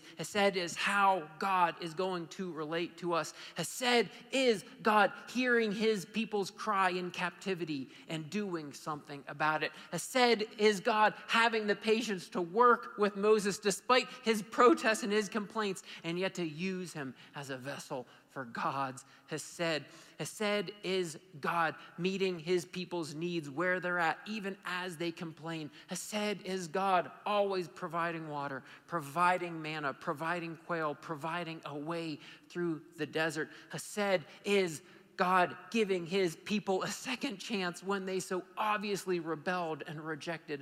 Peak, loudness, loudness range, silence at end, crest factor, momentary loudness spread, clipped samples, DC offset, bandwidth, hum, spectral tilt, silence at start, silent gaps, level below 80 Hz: -14 dBFS; -34 LUFS; 8 LU; 0 s; 20 dB; 13 LU; under 0.1%; under 0.1%; 16 kHz; none; -4 dB/octave; 0 s; none; -82 dBFS